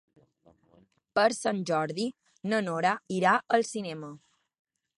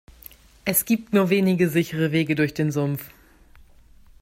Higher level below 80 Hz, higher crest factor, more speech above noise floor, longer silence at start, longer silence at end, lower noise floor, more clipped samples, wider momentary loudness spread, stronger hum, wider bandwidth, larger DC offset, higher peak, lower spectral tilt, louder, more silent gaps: second, -74 dBFS vs -56 dBFS; about the same, 20 dB vs 18 dB; first, 36 dB vs 29 dB; first, 1.15 s vs 0.65 s; second, 0.85 s vs 1.15 s; first, -64 dBFS vs -51 dBFS; neither; first, 13 LU vs 9 LU; neither; second, 11.5 kHz vs 16.5 kHz; neither; second, -10 dBFS vs -6 dBFS; about the same, -4.5 dB/octave vs -5.5 dB/octave; second, -28 LUFS vs -22 LUFS; neither